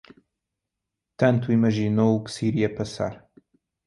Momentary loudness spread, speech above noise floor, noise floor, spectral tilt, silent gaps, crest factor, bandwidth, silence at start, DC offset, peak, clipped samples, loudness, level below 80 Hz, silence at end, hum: 8 LU; 62 dB; -84 dBFS; -7.5 dB/octave; none; 18 dB; 11.5 kHz; 1.2 s; under 0.1%; -6 dBFS; under 0.1%; -23 LUFS; -56 dBFS; 0.7 s; none